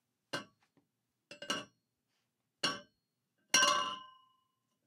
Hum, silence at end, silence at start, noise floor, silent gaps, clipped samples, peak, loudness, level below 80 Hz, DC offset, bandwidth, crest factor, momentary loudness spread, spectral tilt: none; 0.8 s; 0.35 s; -85 dBFS; none; under 0.1%; -14 dBFS; -34 LUFS; -86 dBFS; under 0.1%; 16 kHz; 26 dB; 19 LU; 0 dB/octave